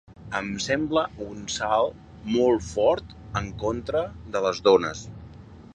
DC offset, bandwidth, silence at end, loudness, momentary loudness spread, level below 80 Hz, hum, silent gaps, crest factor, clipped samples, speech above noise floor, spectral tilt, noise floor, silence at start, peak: under 0.1%; 9.4 kHz; 0.1 s; -25 LUFS; 14 LU; -48 dBFS; none; none; 20 dB; under 0.1%; 20 dB; -4.5 dB/octave; -45 dBFS; 0.1 s; -6 dBFS